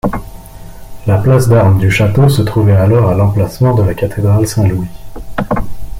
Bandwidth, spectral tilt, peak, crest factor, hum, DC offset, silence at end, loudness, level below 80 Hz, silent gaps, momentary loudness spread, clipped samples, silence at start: 16 kHz; -7.5 dB/octave; 0 dBFS; 10 dB; none; under 0.1%; 0 s; -11 LUFS; -30 dBFS; none; 12 LU; under 0.1%; 0.05 s